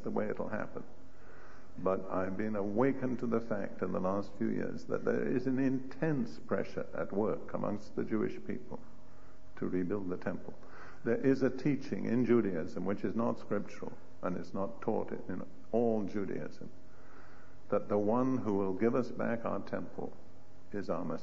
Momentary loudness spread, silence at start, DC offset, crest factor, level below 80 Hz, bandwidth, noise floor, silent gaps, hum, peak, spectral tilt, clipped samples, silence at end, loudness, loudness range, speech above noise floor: 13 LU; 0 s; 1%; 20 dB; -64 dBFS; 7.6 kHz; -59 dBFS; none; none; -16 dBFS; -7.5 dB/octave; under 0.1%; 0 s; -35 LUFS; 5 LU; 24 dB